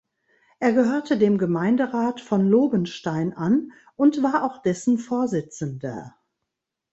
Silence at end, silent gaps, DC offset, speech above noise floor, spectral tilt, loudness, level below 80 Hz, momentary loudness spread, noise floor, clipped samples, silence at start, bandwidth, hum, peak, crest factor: 0.85 s; none; under 0.1%; 61 dB; -7 dB/octave; -22 LUFS; -64 dBFS; 11 LU; -83 dBFS; under 0.1%; 0.6 s; 8.2 kHz; none; -6 dBFS; 16 dB